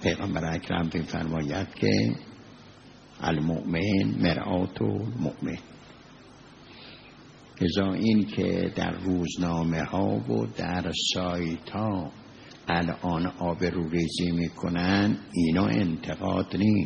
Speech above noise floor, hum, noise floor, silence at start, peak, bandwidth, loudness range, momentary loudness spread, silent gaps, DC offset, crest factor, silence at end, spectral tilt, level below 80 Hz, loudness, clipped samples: 24 dB; none; -50 dBFS; 0 s; -10 dBFS; 8.2 kHz; 4 LU; 11 LU; none; under 0.1%; 18 dB; 0 s; -6 dB/octave; -54 dBFS; -28 LUFS; under 0.1%